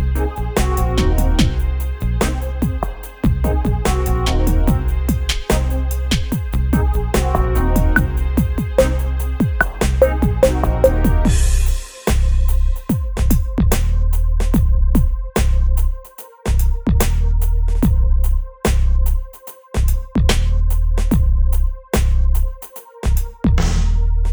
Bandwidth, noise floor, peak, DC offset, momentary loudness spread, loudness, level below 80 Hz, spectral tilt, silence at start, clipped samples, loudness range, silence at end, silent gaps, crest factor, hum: over 20 kHz; -36 dBFS; 0 dBFS; under 0.1%; 6 LU; -18 LUFS; -16 dBFS; -6 dB/octave; 0 s; under 0.1%; 3 LU; 0 s; none; 14 dB; none